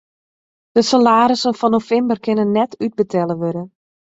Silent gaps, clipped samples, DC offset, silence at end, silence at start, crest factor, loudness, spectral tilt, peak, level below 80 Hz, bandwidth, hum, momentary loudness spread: none; under 0.1%; under 0.1%; 0.4 s; 0.75 s; 16 dB; -16 LUFS; -5.5 dB/octave; -2 dBFS; -60 dBFS; 8 kHz; none; 10 LU